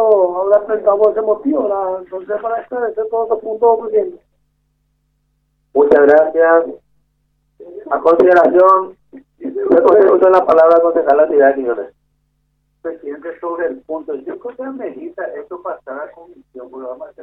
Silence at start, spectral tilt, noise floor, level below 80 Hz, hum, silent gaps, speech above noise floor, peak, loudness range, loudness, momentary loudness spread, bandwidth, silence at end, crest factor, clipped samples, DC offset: 0 s; -7.5 dB/octave; -64 dBFS; -58 dBFS; none; none; 50 dB; 0 dBFS; 14 LU; -13 LUFS; 19 LU; 5.4 kHz; 0 s; 14 dB; under 0.1%; under 0.1%